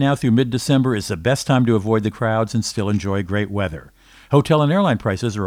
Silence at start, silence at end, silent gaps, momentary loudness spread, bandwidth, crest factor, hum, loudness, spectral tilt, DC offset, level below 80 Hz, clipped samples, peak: 0 s; 0 s; none; 6 LU; 15.5 kHz; 16 dB; none; -19 LUFS; -6.5 dB/octave; under 0.1%; -46 dBFS; under 0.1%; -2 dBFS